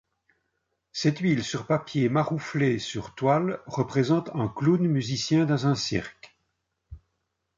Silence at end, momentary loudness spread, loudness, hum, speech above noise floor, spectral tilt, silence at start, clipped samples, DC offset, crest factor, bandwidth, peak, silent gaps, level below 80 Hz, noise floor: 0.6 s; 7 LU; -26 LUFS; none; 53 dB; -6 dB/octave; 0.95 s; under 0.1%; under 0.1%; 16 dB; 7.6 kHz; -10 dBFS; none; -58 dBFS; -78 dBFS